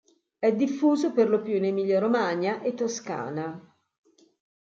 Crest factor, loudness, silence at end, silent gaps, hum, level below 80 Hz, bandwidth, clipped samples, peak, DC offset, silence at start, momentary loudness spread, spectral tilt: 16 dB; -26 LUFS; 1 s; none; none; -78 dBFS; 7.8 kHz; under 0.1%; -10 dBFS; under 0.1%; 0.4 s; 10 LU; -5.5 dB/octave